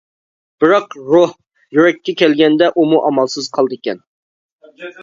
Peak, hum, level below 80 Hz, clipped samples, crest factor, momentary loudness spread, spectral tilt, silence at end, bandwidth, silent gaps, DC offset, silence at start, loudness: 0 dBFS; none; -62 dBFS; under 0.1%; 14 dB; 12 LU; -5 dB/octave; 0 s; 7.6 kHz; 4.07-4.59 s; under 0.1%; 0.6 s; -14 LUFS